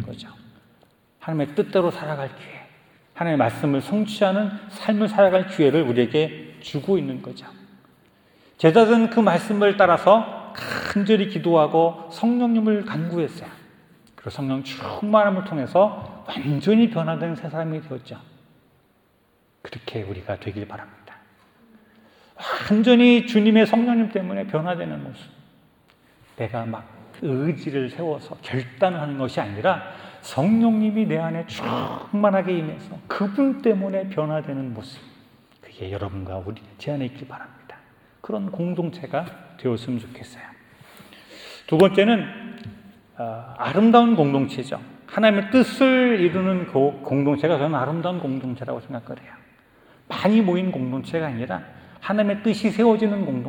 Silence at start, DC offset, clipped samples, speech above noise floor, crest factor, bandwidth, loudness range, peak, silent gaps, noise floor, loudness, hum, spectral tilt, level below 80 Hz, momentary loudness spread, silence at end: 0 s; under 0.1%; under 0.1%; 41 dB; 20 dB; 19 kHz; 12 LU; -2 dBFS; none; -62 dBFS; -21 LUFS; none; -7 dB/octave; -64 dBFS; 19 LU; 0 s